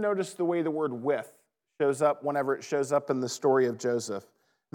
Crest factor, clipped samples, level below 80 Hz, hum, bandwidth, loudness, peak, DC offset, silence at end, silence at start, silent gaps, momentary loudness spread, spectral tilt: 16 dB; under 0.1%; under -90 dBFS; none; 16.5 kHz; -29 LUFS; -12 dBFS; under 0.1%; 0.55 s; 0 s; none; 7 LU; -5 dB/octave